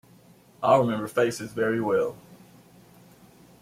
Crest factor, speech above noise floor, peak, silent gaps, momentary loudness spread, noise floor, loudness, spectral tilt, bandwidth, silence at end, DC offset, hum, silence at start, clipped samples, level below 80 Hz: 20 dB; 31 dB; -8 dBFS; none; 7 LU; -55 dBFS; -25 LUFS; -6 dB/octave; 16 kHz; 1.25 s; under 0.1%; none; 0.6 s; under 0.1%; -66 dBFS